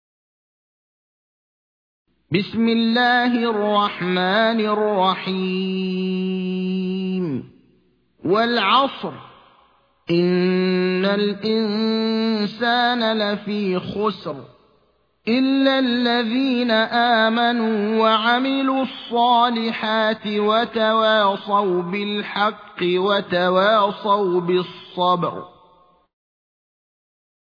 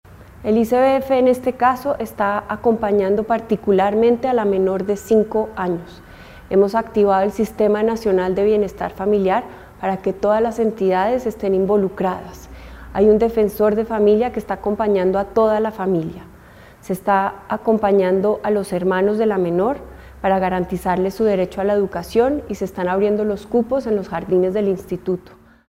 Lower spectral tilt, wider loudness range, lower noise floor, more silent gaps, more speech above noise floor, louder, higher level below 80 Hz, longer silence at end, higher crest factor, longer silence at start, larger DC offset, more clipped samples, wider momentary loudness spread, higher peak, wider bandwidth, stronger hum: about the same, -7.5 dB/octave vs -7 dB/octave; about the same, 4 LU vs 2 LU; first, -63 dBFS vs -43 dBFS; neither; first, 43 dB vs 26 dB; about the same, -19 LUFS vs -19 LUFS; second, -66 dBFS vs -44 dBFS; first, 2.05 s vs 0.55 s; about the same, 18 dB vs 16 dB; first, 2.3 s vs 0.1 s; neither; neither; about the same, 7 LU vs 8 LU; about the same, -4 dBFS vs -2 dBFS; second, 5.4 kHz vs 16 kHz; neither